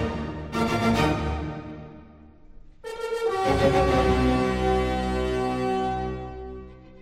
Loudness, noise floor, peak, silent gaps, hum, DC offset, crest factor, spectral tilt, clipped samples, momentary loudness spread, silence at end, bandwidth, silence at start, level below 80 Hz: -25 LUFS; -48 dBFS; -8 dBFS; none; none; under 0.1%; 18 dB; -6.5 dB/octave; under 0.1%; 18 LU; 0 s; 15.5 kHz; 0 s; -36 dBFS